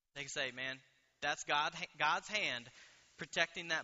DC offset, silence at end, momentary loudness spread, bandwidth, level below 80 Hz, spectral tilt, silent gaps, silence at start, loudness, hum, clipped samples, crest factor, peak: under 0.1%; 0 s; 9 LU; 8 kHz; -76 dBFS; 0.5 dB/octave; none; 0.15 s; -38 LUFS; none; under 0.1%; 24 dB; -16 dBFS